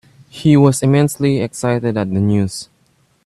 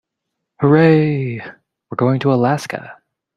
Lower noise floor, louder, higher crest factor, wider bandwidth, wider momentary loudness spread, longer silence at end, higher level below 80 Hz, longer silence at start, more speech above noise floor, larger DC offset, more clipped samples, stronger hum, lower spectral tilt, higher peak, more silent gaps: second, -58 dBFS vs -78 dBFS; about the same, -15 LUFS vs -15 LUFS; about the same, 14 dB vs 16 dB; about the same, 13 kHz vs 12 kHz; second, 7 LU vs 18 LU; first, 0.6 s vs 0.45 s; first, -50 dBFS vs -56 dBFS; second, 0.35 s vs 0.6 s; second, 43 dB vs 63 dB; neither; neither; neither; second, -6.5 dB/octave vs -8 dB/octave; about the same, 0 dBFS vs -2 dBFS; neither